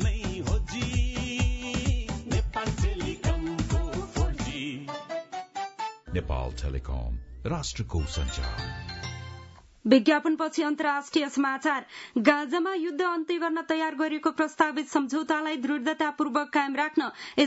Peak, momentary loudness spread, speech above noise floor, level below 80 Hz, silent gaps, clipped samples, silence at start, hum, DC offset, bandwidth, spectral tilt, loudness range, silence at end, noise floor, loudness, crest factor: -6 dBFS; 11 LU; 21 dB; -36 dBFS; none; under 0.1%; 0 s; none; under 0.1%; 8 kHz; -5.5 dB/octave; 7 LU; 0 s; -48 dBFS; -28 LUFS; 22 dB